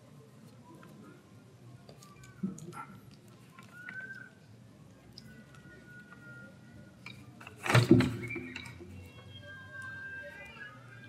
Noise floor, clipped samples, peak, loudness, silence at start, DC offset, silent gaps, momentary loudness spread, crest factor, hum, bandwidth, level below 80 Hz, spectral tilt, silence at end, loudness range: -56 dBFS; under 0.1%; -8 dBFS; -33 LUFS; 0 s; under 0.1%; none; 26 LU; 30 dB; none; 15 kHz; -66 dBFS; -6 dB/octave; 0 s; 18 LU